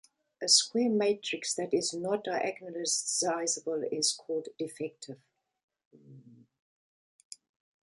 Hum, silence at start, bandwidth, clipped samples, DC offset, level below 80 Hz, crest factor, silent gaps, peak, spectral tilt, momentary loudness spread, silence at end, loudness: none; 0.4 s; 11.5 kHz; under 0.1%; under 0.1%; -84 dBFS; 24 dB; 5.63-5.68 s, 5.85-5.91 s; -10 dBFS; -2 dB/octave; 23 LU; 1.5 s; -30 LUFS